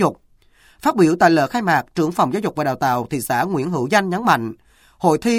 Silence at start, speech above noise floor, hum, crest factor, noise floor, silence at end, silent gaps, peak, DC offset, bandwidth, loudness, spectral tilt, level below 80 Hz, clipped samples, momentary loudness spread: 0 s; 36 dB; none; 18 dB; -54 dBFS; 0 s; none; 0 dBFS; under 0.1%; 16.5 kHz; -18 LUFS; -5.5 dB/octave; -54 dBFS; under 0.1%; 7 LU